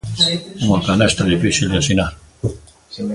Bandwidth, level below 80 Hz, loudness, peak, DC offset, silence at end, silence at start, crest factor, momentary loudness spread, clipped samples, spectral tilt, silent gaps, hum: 11.5 kHz; -36 dBFS; -17 LUFS; 0 dBFS; under 0.1%; 0 s; 0.05 s; 18 dB; 11 LU; under 0.1%; -4.5 dB/octave; none; none